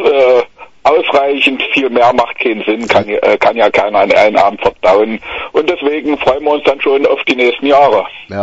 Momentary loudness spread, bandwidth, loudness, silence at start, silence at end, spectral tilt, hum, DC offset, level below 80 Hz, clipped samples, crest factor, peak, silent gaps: 6 LU; 8 kHz; -11 LUFS; 0 s; 0 s; -5 dB/octave; none; under 0.1%; -46 dBFS; 0.1%; 10 dB; 0 dBFS; none